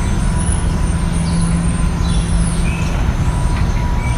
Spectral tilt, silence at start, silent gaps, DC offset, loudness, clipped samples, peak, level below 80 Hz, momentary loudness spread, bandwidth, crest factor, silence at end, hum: -5.5 dB/octave; 0 s; none; under 0.1%; -17 LUFS; under 0.1%; -2 dBFS; -18 dBFS; 2 LU; 11 kHz; 12 dB; 0 s; none